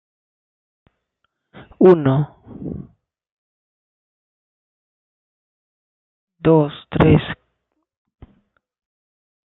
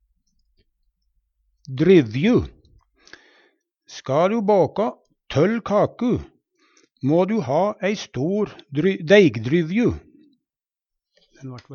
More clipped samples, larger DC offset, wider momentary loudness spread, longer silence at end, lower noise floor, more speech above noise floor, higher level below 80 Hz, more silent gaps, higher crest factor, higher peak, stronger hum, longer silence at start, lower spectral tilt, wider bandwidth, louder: neither; neither; about the same, 20 LU vs 19 LU; first, 2.1 s vs 0 s; second, -73 dBFS vs -89 dBFS; second, 59 dB vs 70 dB; about the same, -46 dBFS vs -50 dBFS; first, 3.32-6.27 s vs none; about the same, 22 dB vs 20 dB; about the same, 0 dBFS vs -2 dBFS; neither; about the same, 1.8 s vs 1.7 s; first, -11 dB/octave vs -7 dB/octave; second, 4.1 kHz vs 7 kHz; first, -16 LUFS vs -20 LUFS